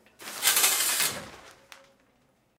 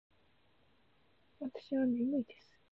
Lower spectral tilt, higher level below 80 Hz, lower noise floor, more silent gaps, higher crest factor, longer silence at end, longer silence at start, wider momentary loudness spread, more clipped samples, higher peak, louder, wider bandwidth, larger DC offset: second, 1.5 dB/octave vs -6 dB/octave; first, -70 dBFS vs -76 dBFS; second, -67 dBFS vs -73 dBFS; neither; first, 24 dB vs 16 dB; first, 1.1 s vs 0.4 s; second, 0.2 s vs 1.4 s; first, 19 LU vs 13 LU; neither; first, -6 dBFS vs -24 dBFS; first, -23 LUFS vs -37 LUFS; first, 17.5 kHz vs 5.8 kHz; neither